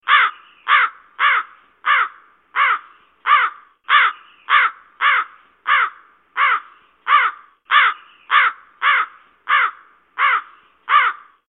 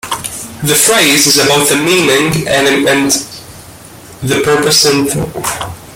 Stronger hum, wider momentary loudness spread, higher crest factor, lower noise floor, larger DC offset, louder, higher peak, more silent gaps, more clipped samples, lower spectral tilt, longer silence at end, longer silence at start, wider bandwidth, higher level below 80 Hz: neither; about the same, 14 LU vs 12 LU; first, 18 dB vs 12 dB; first, -41 dBFS vs -33 dBFS; neither; second, -17 LUFS vs -9 LUFS; about the same, 0 dBFS vs 0 dBFS; neither; neither; second, -1 dB/octave vs -2.5 dB/octave; first, 0.3 s vs 0 s; about the same, 0.05 s vs 0.05 s; second, 4.2 kHz vs over 20 kHz; second, -80 dBFS vs -44 dBFS